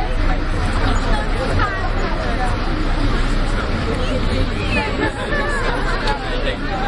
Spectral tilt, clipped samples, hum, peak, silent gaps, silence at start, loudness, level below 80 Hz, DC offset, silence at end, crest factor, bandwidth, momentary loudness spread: -5.5 dB/octave; under 0.1%; none; -4 dBFS; none; 0 s; -21 LUFS; -20 dBFS; under 0.1%; 0 s; 14 dB; 11 kHz; 2 LU